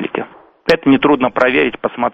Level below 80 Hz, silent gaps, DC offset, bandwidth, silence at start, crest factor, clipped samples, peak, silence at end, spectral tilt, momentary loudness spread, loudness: -46 dBFS; none; under 0.1%; 8.4 kHz; 0 s; 14 dB; under 0.1%; 0 dBFS; 0 s; -6.5 dB/octave; 12 LU; -14 LUFS